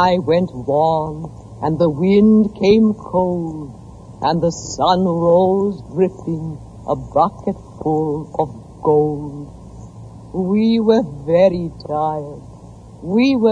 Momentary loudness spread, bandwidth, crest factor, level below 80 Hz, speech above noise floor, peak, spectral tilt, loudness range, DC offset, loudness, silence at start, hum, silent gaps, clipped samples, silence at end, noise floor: 18 LU; 8 kHz; 16 dB; -44 dBFS; 22 dB; -2 dBFS; -7 dB/octave; 4 LU; under 0.1%; -17 LUFS; 0 s; none; none; under 0.1%; 0 s; -38 dBFS